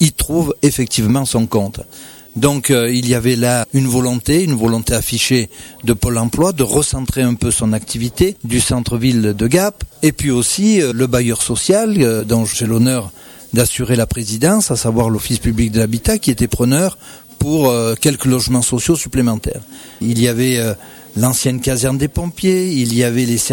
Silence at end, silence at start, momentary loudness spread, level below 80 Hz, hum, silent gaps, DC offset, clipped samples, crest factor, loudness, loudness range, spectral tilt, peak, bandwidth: 0 s; 0 s; 6 LU; -32 dBFS; none; none; under 0.1%; under 0.1%; 14 dB; -15 LUFS; 2 LU; -5 dB/octave; -2 dBFS; 19 kHz